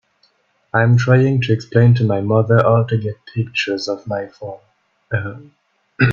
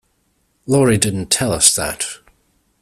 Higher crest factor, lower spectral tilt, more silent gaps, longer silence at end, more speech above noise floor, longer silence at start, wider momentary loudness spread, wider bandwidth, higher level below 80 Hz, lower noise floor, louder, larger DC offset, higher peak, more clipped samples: about the same, 16 dB vs 18 dB; first, -7.5 dB/octave vs -3.5 dB/octave; neither; second, 0 s vs 0.65 s; about the same, 45 dB vs 48 dB; about the same, 0.75 s vs 0.65 s; second, 12 LU vs 15 LU; second, 7.2 kHz vs 16 kHz; second, -50 dBFS vs -44 dBFS; second, -60 dBFS vs -64 dBFS; about the same, -17 LUFS vs -15 LUFS; neither; about the same, 0 dBFS vs 0 dBFS; neither